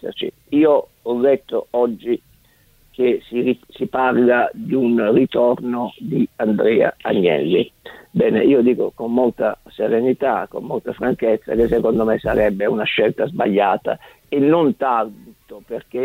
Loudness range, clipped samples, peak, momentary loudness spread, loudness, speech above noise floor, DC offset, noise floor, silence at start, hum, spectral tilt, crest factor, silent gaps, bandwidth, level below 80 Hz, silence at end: 2 LU; under 0.1%; -4 dBFS; 10 LU; -18 LUFS; 37 dB; under 0.1%; -54 dBFS; 0.05 s; none; -8 dB/octave; 16 dB; none; 16 kHz; -48 dBFS; 0 s